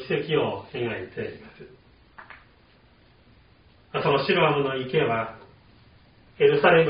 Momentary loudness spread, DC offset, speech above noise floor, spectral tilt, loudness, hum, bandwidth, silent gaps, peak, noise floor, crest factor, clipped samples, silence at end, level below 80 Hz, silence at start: 19 LU; under 0.1%; 34 dB; -3.5 dB/octave; -24 LUFS; none; 5.2 kHz; none; -4 dBFS; -57 dBFS; 22 dB; under 0.1%; 0 s; -60 dBFS; 0 s